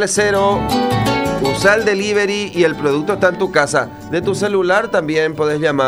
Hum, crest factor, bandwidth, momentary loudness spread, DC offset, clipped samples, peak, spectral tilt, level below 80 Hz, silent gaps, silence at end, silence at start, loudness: none; 14 dB; 16 kHz; 4 LU; 0.2%; under 0.1%; 0 dBFS; -4.5 dB/octave; -42 dBFS; none; 0 s; 0 s; -16 LUFS